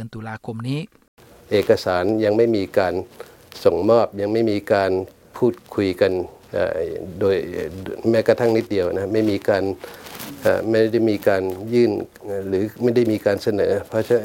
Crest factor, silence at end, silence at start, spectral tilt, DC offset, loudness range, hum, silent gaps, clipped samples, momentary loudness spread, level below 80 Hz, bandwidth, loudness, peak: 18 dB; 0 s; 0 s; -6.5 dB/octave; under 0.1%; 2 LU; none; 1.08-1.17 s; under 0.1%; 12 LU; -54 dBFS; 17 kHz; -20 LUFS; -2 dBFS